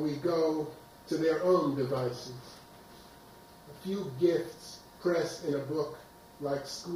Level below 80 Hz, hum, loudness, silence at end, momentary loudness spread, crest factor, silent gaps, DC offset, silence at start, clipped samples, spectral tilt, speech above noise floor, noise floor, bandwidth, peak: -66 dBFS; none; -32 LUFS; 0 s; 24 LU; 18 dB; none; under 0.1%; 0 s; under 0.1%; -6 dB/octave; 22 dB; -54 dBFS; 16.5 kHz; -14 dBFS